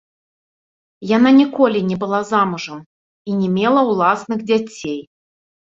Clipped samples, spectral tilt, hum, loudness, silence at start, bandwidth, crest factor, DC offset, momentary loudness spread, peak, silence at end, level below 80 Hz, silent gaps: under 0.1%; -6.5 dB/octave; none; -17 LUFS; 1 s; 7.8 kHz; 16 dB; under 0.1%; 17 LU; -2 dBFS; 0.8 s; -62 dBFS; 2.86-3.25 s